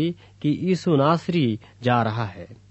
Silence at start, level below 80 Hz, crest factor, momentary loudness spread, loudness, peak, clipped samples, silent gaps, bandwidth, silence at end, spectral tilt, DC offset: 0 s; -60 dBFS; 18 dB; 10 LU; -23 LUFS; -4 dBFS; under 0.1%; none; 8.4 kHz; 0.15 s; -7.5 dB/octave; under 0.1%